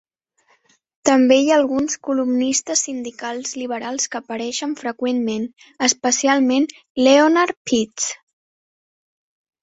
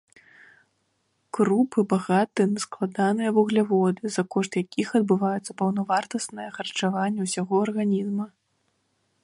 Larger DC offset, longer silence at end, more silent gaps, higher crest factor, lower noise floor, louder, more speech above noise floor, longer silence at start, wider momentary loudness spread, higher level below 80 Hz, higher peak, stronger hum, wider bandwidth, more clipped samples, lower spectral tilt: neither; first, 1.45 s vs 0.95 s; first, 6.90-6.95 s, 7.57-7.65 s vs none; about the same, 18 dB vs 16 dB; second, -62 dBFS vs -72 dBFS; first, -19 LUFS vs -25 LUFS; second, 44 dB vs 48 dB; second, 1.05 s vs 1.35 s; first, 13 LU vs 9 LU; first, -62 dBFS vs -72 dBFS; first, -2 dBFS vs -8 dBFS; neither; second, 8.2 kHz vs 11.5 kHz; neither; second, -2 dB/octave vs -5.5 dB/octave